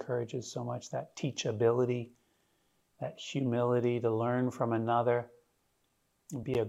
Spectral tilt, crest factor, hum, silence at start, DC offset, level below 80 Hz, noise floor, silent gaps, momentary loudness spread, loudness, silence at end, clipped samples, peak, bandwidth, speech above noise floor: -6.5 dB/octave; 18 dB; none; 0 s; under 0.1%; -72 dBFS; -76 dBFS; none; 13 LU; -33 LUFS; 0 s; under 0.1%; -16 dBFS; 12 kHz; 44 dB